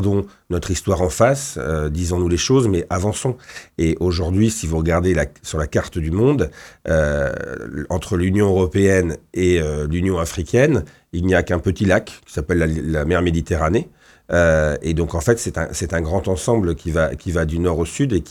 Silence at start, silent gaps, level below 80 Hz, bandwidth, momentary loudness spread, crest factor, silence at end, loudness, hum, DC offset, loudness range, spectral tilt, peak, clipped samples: 0 s; none; -32 dBFS; 14 kHz; 8 LU; 18 dB; 0 s; -19 LUFS; none; under 0.1%; 2 LU; -6 dB/octave; -2 dBFS; under 0.1%